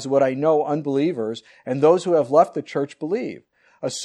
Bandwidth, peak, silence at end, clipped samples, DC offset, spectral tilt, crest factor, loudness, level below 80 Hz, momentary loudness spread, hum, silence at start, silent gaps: 11 kHz; -4 dBFS; 0 s; under 0.1%; under 0.1%; -6 dB/octave; 18 dB; -21 LUFS; -72 dBFS; 13 LU; none; 0 s; none